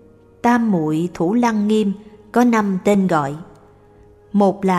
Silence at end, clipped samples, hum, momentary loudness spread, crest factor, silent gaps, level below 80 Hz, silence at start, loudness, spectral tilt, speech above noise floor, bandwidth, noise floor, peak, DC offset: 0 s; under 0.1%; none; 7 LU; 16 dB; none; -54 dBFS; 0.45 s; -18 LUFS; -7 dB/octave; 31 dB; 13 kHz; -48 dBFS; -2 dBFS; under 0.1%